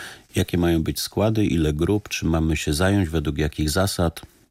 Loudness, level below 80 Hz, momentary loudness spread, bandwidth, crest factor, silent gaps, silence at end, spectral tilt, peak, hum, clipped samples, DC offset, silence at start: -22 LUFS; -34 dBFS; 5 LU; 16 kHz; 14 dB; none; 0.3 s; -5.5 dB/octave; -8 dBFS; none; under 0.1%; under 0.1%; 0 s